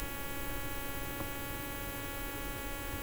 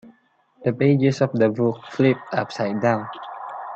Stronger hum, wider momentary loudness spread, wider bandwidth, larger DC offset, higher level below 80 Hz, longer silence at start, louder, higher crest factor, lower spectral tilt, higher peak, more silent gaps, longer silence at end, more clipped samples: neither; second, 1 LU vs 15 LU; first, over 20 kHz vs 8 kHz; neither; first, -46 dBFS vs -64 dBFS; about the same, 0 s vs 0.05 s; second, -39 LUFS vs -21 LUFS; about the same, 18 dB vs 18 dB; second, -3.5 dB/octave vs -7.5 dB/octave; second, -20 dBFS vs -4 dBFS; neither; about the same, 0 s vs 0 s; neither